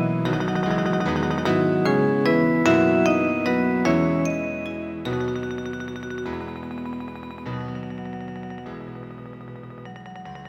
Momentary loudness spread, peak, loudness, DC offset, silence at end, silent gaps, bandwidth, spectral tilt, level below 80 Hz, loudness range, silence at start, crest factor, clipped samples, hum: 19 LU; -4 dBFS; -23 LUFS; under 0.1%; 0 s; none; 14 kHz; -7 dB/octave; -50 dBFS; 14 LU; 0 s; 20 dB; under 0.1%; none